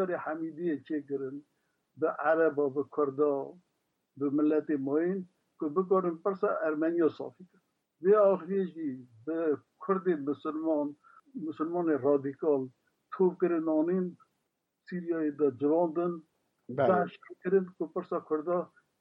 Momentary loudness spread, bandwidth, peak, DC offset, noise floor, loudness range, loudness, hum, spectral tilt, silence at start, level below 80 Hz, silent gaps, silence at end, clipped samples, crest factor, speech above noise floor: 13 LU; 5.4 kHz; -14 dBFS; under 0.1%; -82 dBFS; 2 LU; -31 LUFS; none; -10.5 dB/octave; 0 s; -86 dBFS; none; 0.35 s; under 0.1%; 18 dB; 52 dB